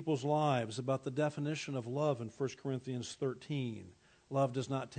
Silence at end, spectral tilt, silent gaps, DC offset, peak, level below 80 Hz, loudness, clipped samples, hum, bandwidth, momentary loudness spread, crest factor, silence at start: 0 s; -6.5 dB/octave; none; under 0.1%; -20 dBFS; -78 dBFS; -37 LUFS; under 0.1%; none; 9 kHz; 8 LU; 18 dB; 0 s